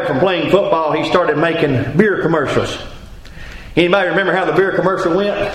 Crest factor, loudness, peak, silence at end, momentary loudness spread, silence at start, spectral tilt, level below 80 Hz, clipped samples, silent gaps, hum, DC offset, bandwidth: 16 dB; -15 LUFS; 0 dBFS; 0 s; 10 LU; 0 s; -6.5 dB/octave; -38 dBFS; under 0.1%; none; none; under 0.1%; 12.5 kHz